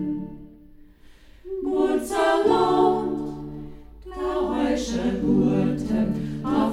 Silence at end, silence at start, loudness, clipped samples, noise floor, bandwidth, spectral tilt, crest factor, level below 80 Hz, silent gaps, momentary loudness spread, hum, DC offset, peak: 0 s; 0 s; -23 LUFS; under 0.1%; -49 dBFS; 14.5 kHz; -6.5 dB/octave; 16 dB; -44 dBFS; none; 17 LU; none; under 0.1%; -8 dBFS